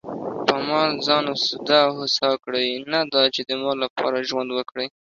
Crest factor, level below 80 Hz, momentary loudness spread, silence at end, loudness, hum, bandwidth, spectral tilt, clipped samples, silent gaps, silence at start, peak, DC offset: 20 dB; -66 dBFS; 8 LU; 0.25 s; -21 LUFS; none; 7.4 kHz; -3.5 dB/octave; under 0.1%; 3.90-3.96 s; 0.05 s; -4 dBFS; under 0.1%